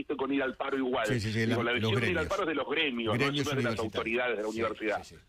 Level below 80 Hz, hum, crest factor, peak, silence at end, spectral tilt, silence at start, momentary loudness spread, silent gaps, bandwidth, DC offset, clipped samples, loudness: -58 dBFS; none; 14 dB; -16 dBFS; 0.1 s; -5.5 dB/octave; 0 s; 4 LU; none; 15.5 kHz; under 0.1%; under 0.1%; -30 LUFS